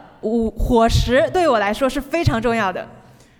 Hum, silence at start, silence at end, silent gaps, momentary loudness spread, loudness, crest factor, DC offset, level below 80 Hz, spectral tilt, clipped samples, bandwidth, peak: none; 0.25 s; 0.5 s; none; 7 LU; -18 LUFS; 14 dB; under 0.1%; -30 dBFS; -6 dB/octave; under 0.1%; 19 kHz; -4 dBFS